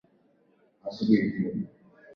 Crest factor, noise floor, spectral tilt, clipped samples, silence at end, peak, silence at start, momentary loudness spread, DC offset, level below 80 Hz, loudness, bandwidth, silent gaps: 22 dB; -65 dBFS; -8.5 dB/octave; under 0.1%; 0 s; -10 dBFS; 0.85 s; 17 LU; under 0.1%; -66 dBFS; -27 LUFS; 6.2 kHz; none